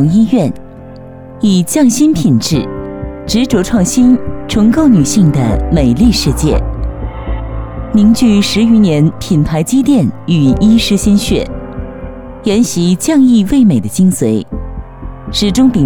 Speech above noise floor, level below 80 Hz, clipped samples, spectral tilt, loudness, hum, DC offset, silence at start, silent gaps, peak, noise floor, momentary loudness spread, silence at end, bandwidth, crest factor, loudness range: 21 dB; -24 dBFS; under 0.1%; -6 dB/octave; -11 LUFS; none; under 0.1%; 0 s; none; 0 dBFS; -30 dBFS; 15 LU; 0 s; 19 kHz; 10 dB; 2 LU